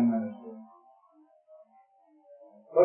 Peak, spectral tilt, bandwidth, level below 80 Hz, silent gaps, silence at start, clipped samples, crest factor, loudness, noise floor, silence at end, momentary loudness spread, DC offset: -10 dBFS; -12.5 dB/octave; 2.5 kHz; -86 dBFS; none; 0 s; under 0.1%; 22 dB; -33 LUFS; -62 dBFS; 0 s; 28 LU; under 0.1%